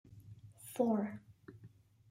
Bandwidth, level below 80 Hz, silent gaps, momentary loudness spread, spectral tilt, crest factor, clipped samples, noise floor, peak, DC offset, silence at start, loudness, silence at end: 16 kHz; -76 dBFS; none; 24 LU; -7 dB/octave; 20 dB; under 0.1%; -61 dBFS; -20 dBFS; under 0.1%; 0.1 s; -37 LUFS; 0.45 s